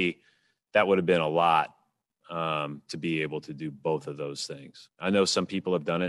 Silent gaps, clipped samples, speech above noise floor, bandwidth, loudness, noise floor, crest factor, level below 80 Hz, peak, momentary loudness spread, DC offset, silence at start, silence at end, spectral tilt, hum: none; under 0.1%; 43 dB; 12 kHz; -28 LUFS; -71 dBFS; 20 dB; -70 dBFS; -8 dBFS; 13 LU; under 0.1%; 0 s; 0 s; -4.5 dB/octave; none